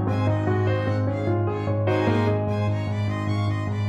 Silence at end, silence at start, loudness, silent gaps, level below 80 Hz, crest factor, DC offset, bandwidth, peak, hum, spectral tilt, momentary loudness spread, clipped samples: 0 s; 0 s; -24 LUFS; none; -50 dBFS; 14 dB; under 0.1%; 7.8 kHz; -10 dBFS; none; -8.5 dB/octave; 4 LU; under 0.1%